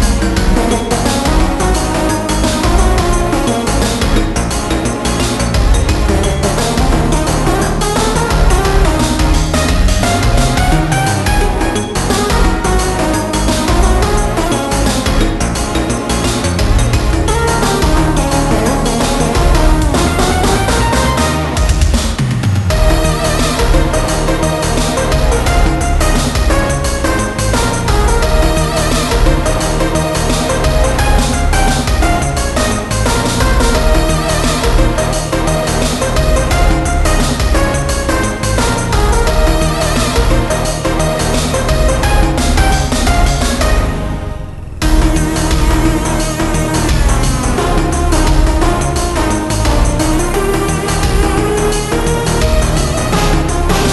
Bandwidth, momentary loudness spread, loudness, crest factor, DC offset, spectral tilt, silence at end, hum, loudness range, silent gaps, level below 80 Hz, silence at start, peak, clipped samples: 12.5 kHz; 3 LU; -13 LUFS; 12 dB; under 0.1%; -4.5 dB/octave; 0 s; none; 1 LU; none; -14 dBFS; 0 s; 0 dBFS; under 0.1%